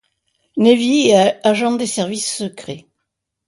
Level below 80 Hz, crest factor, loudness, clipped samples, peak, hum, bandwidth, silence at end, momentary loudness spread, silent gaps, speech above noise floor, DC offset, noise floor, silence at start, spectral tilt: -62 dBFS; 16 dB; -15 LUFS; under 0.1%; 0 dBFS; none; 11.5 kHz; 0.7 s; 18 LU; none; 61 dB; under 0.1%; -76 dBFS; 0.55 s; -4 dB/octave